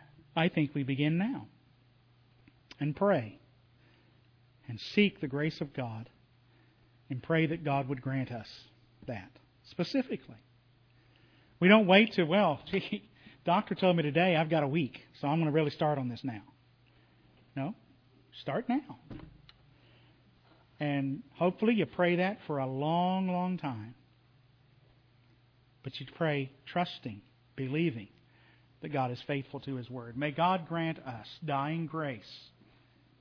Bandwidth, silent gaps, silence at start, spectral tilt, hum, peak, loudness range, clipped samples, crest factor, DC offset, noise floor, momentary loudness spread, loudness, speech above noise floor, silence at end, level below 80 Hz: 5.4 kHz; none; 0.35 s; -8 dB/octave; none; -8 dBFS; 11 LU; under 0.1%; 26 dB; under 0.1%; -65 dBFS; 18 LU; -32 LUFS; 34 dB; 0.8 s; -70 dBFS